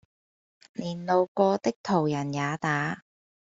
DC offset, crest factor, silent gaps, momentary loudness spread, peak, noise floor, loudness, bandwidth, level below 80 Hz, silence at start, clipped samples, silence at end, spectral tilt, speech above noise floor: under 0.1%; 20 dB; 1.28-1.35 s, 1.76-1.84 s; 12 LU; -8 dBFS; under -90 dBFS; -27 LUFS; 7.8 kHz; -68 dBFS; 0.8 s; under 0.1%; 0.6 s; -6.5 dB/octave; over 64 dB